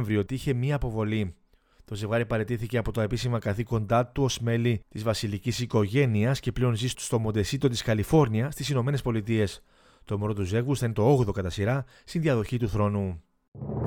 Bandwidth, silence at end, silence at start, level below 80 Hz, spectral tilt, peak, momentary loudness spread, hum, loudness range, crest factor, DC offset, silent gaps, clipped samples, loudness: 17.5 kHz; 0 s; 0 s; -46 dBFS; -6.5 dB/octave; -8 dBFS; 8 LU; none; 3 LU; 18 dB; under 0.1%; 13.48-13.52 s; under 0.1%; -27 LUFS